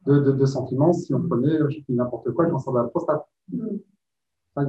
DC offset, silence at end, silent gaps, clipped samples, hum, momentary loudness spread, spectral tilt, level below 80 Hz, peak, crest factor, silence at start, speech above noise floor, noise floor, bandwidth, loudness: under 0.1%; 0 s; none; under 0.1%; none; 12 LU; -9 dB/octave; -64 dBFS; -6 dBFS; 16 dB; 0.05 s; 63 dB; -85 dBFS; 8 kHz; -23 LUFS